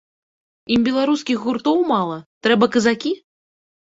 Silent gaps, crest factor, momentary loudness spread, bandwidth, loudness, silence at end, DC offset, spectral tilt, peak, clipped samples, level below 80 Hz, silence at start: 2.26-2.41 s; 18 dB; 8 LU; 8 kHz; -19 LUFS; 0.8 s; under 0.1%; -5 dB/octave; -2 dBFS; under 0.1%; -56 dBFS; 0.7 s